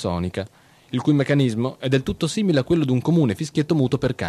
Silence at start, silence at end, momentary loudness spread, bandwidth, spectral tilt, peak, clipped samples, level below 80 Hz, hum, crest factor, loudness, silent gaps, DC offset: 0 s; 0 s; 8 LU; 12.5 kHz; -7 dB/octave; -6 dBFS; under 0.1%; -48 dBFS; none; 16 dB; -21 LUFS; none; under 0.1%